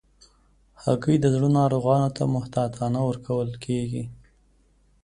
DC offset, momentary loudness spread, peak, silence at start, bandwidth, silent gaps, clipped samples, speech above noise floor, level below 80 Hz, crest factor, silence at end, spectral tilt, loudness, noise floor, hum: under 0.1%; 9 LU; -6 dBFS; 0.8 s; 10.5 kHz; none; under 0.1%; 38 dB; -52 dBFS; 18 dB; 0.9 s; -8 dB/octave; -24 LUFS; -61 dBFS; none